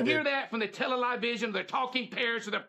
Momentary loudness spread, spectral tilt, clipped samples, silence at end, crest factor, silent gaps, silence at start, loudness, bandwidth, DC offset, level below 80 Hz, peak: 4 LU; -4 dB/octave; under 0.1%; 0 s; 18 dB; none; 0 s; -30 LUFS; 12.5 kHz; under 0.1%; -84 dBFS; -14 dBFS